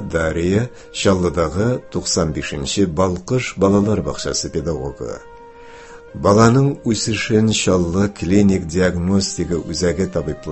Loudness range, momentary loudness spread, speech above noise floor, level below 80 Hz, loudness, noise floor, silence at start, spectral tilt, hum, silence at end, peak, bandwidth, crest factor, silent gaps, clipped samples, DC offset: 4 LU; 8 LU; 21 dB; -34 dBFS; -18 LUFS; -39 dBFS; 0 s; -5.5 dB/octave; none; 0 s; 0 dBFS; 8.6 kHz; 18 dB; none; under 0.1%; under 0.1%